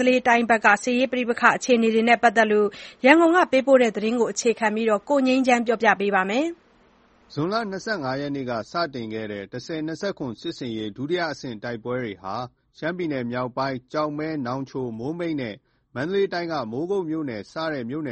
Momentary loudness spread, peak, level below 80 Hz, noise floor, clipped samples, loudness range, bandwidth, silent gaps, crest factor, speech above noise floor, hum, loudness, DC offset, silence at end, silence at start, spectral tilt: 14 LU; -2 dBFS; -64 dBFS; -57 dBFS; under 0.1%; 11 LU; 8.4 kHz; none; 22 dB; 35 dB; none; -23 LUFS; under 0.1%; 0 s; 0 s; -5 dB/octave